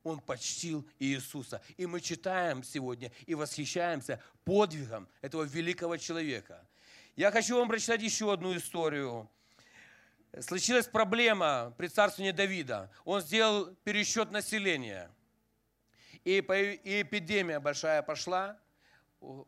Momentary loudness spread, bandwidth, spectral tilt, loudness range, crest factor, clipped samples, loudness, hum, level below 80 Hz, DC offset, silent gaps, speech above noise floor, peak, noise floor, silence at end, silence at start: 13 LU; 15.5 kHz; -3 dB/octave; 5 LU; 22 dB; under 0.1%; -32 LUFS; none; -76 dBFS; under 0.1%; none; 43 dB; -12 dBFS; -76 dBFS; 0.05 s; 0.05 s